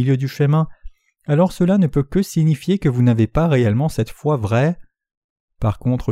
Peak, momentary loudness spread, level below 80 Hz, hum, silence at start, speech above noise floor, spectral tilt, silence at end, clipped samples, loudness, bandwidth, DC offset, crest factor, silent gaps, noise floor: -4 dBFS; 6 LU; -38 dBFS; none; 0 s; 21 dB; -8 dB/octave; 0 s; under 0.1%; -18 LUFS; 15 kHz; under 0.1%; 14 dB; 5.17-5.48 s; -37 dBFS